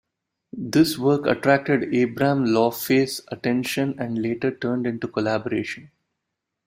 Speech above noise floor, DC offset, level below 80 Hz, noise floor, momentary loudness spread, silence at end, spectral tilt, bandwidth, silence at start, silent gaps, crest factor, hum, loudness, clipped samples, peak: 59 dB; under 0.1%; -60 dBFS; -81 dBFS; 8 LU; 0.8 s; -5.5 dB/octave; 16 kHz; 0.55 s; none; 20 dB; none; -22 LUFS; under 0.1%; -2 dBFS